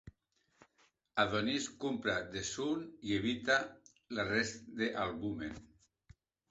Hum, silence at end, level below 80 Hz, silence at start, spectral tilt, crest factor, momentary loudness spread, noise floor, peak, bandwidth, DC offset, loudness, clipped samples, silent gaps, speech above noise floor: none; 0.85 s; -64 dBFS; 0.05 s; -2.5 dB/octave; 22 dB; 9 LU; -77 dBFS; -16 dBFS; 8 kHz; under 0.1%; -36 LUFS; under 0.1%; none; 41 dB